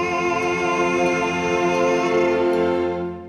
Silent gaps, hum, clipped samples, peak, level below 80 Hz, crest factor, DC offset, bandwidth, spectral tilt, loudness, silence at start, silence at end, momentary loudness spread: none; none; under 0.1%; -8 dBFS; -50 dBFS; 12 dB; under 0.1%; 11 kHz; -5 dB/octave; -20 LUFS; 0 s; 0 s; 2 LU